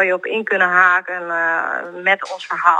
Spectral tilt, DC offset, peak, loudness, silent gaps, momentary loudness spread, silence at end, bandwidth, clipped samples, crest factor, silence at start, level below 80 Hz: -3.5 dB/octave; under 0.1%; 0 dBFS; -17 LUFS; none; 10 LU; 0 s; 9.8 kHz; under 0.1%; 16 dB; 0 s; -78 dBFS